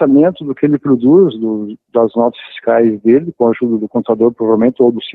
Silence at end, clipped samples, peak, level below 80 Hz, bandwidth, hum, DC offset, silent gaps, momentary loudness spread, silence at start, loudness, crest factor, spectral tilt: 0.05 s; under 0.1%; 0 dBFS; -56 dBFS; 4.1 kHz; none; under 0.1%; none; 8 LU; 0 s; -13 LUFS; 12 dB; -10 dB/octave